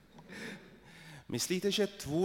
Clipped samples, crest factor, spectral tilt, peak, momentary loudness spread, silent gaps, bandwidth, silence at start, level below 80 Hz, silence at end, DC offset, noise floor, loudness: under 0.1%; 18 dB; -4 dB/octave; -20 dBFS; 21 LU; none; 16.5 kHz; 0.15 s; -66 dBFS; 0 s; under 0.1%; -55 dBFS; -35 LUFS